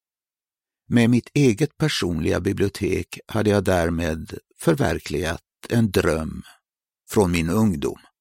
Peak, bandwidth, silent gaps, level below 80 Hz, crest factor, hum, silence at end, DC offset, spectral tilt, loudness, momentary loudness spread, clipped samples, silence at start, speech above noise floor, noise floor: -4 dBFS; 16.5 kHz; none; -42 dBFS; 18 dB; none; 0.25 s; under 0.1%; -6 dB/octave; -22 LUFS; 9 LU; under 0.1%; 0.9 s; over 69 dB; under -90 dBFS